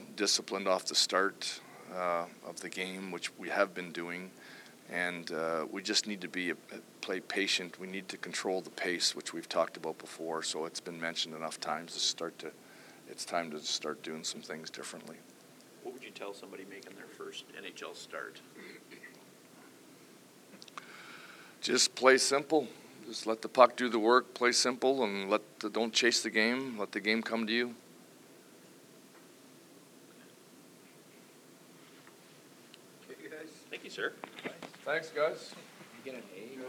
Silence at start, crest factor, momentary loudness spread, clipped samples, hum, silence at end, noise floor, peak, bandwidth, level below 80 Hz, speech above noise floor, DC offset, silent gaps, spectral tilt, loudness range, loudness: 0 s; 28 dB; 22 LU; under 0.1%; none; 0 s; -57 dBFS; -6 dBFS; 19.5 kHz; under -90 dBFS; 24 dB; under 0.1%; none; -2 dB/octave; 18 LU; -33 LUFS